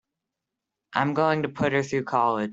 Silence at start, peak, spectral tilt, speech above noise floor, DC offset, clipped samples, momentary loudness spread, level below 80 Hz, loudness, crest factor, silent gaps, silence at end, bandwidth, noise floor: 0.9 s; -6 dBFS; -6.5 dB/octave; 61 dB; under 0.1%; under 0.1%; 3 LU; -64 dBFS; -25 LUFS; 20 dB; none; 0 s; 8 kHz; -85 dBFS